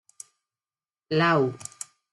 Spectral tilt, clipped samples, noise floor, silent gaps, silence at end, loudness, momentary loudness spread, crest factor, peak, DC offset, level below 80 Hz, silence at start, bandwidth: -5 dB/octave; under 0.1%; under -90 dBFS; none; 0.45 s; -24 LUFS; 24 LU; 20 dB; -8 dBFS; under 0.1%; -68 dBFS; 1.1 s; 12 kHz